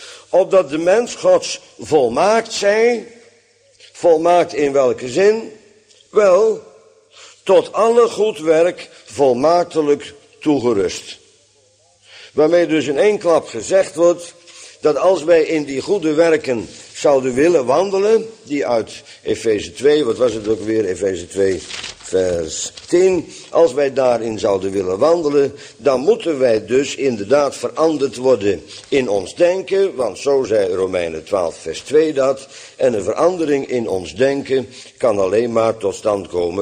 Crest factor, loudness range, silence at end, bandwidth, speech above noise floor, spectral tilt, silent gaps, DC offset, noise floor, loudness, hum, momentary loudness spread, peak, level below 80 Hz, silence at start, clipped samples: 14 dB; 3 LU; 0 s; 10.5 kHz; 39 dB; -4.5 dB/octave; none; under 0.1%; -55 dBFS; -16 LUFS; none; 9 LU; -2 dBFS; -54 dBFS; 0 s; under 0.1%